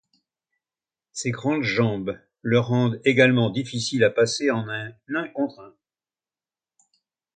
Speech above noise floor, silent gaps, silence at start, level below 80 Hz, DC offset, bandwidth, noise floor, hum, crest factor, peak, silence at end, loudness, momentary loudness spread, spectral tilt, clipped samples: over 68 dB; none; 1.15 s; -62 dBFS; under 0.1%; 9.4 kHz; under -90 dBFS; none; 22 dB; -4 dBFS; 1.65 s; -23 LUFS; 13 LU; -5.5 dB/octave; under 0.1%